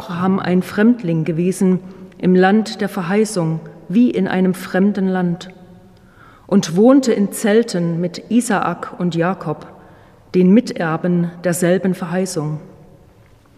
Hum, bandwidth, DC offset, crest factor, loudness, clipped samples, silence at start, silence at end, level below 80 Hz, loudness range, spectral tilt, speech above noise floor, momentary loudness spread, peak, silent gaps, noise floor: none; 14.5 kHz; under 0.1%; 16 dB; -17 LUFS; under 0.1%; 0 s; 0.85 s; -56 dBFS; 2 LU; -6.5 dB/octave; 32 dB; 10 LU; 0 dBFS; none; -48 dBFS